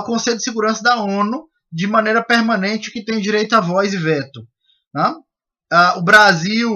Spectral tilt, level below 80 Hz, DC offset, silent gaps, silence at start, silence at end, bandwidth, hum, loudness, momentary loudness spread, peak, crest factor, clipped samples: -4 dB/octave; -62 dBFS; under 0.1%; 4.87-4.91 s; 0 s; 0 s; 14.5 kHz; none; -15 LUFS; 14 LU; 0 dBFS; 16 dB; under 0.1%